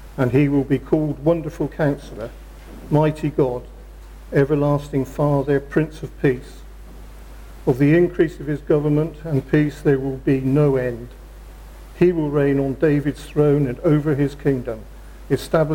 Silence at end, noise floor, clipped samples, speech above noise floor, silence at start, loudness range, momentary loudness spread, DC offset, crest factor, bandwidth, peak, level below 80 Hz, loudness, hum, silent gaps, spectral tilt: 0 s; -38 dBFS; under 0.1%; 19 dB; 0 s; 3 LU; 10 LU; under 0.1%; 14 dB; 16.5 kHz; -6 dBFS; -38 dBFS; -20 LUFS; none; none; -8.5 dB/octave